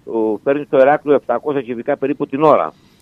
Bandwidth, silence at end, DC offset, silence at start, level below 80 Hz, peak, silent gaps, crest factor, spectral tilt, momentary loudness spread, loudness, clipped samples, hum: 5.4 kHz; 0.3 s; under 0.1%; 0.05 s; -62 dBFS; 0 dBFS; none; 16 dB; -8.5 dB/octave; 9 LU; -16 LUFS; under 0.1%; none